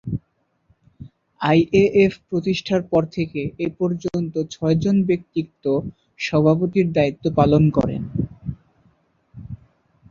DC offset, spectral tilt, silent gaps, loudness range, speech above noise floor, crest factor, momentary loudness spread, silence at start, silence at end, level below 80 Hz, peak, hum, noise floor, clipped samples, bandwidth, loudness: under 0.1%; -7.5 dB/octave; none; 3 LU; 48 dB; 18 dB; 14 LU; 0.05 s; 0.55 s; -46 dBFS; -2 dBFS; none; -67 dBFS; under 0.1%; 7.4 kHz; -20 LUFS